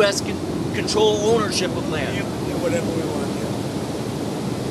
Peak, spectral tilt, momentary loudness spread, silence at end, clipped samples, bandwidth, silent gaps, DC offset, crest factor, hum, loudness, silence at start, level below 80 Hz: -6 dBFS; -4.5 dB/octave; 8 LU; 0 s; under 0.1%; 14 kHz; none; under 0.1%; 16 dB; none; -22 LUFS; 0 s; -48 dBFS